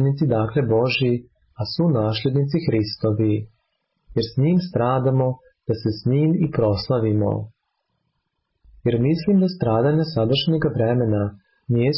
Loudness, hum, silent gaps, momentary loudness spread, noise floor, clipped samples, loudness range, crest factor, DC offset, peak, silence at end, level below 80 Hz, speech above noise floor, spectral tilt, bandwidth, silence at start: -21 LUFS; none; none; 8 LU; -74 dBFS; under 0.1%; 2 LU; 12 dB; under 0.1%; -10 dBFS; 0 s; -48 dBFS; 55 dB; -11.5 dB/octave; 5.8 kHz; 0 s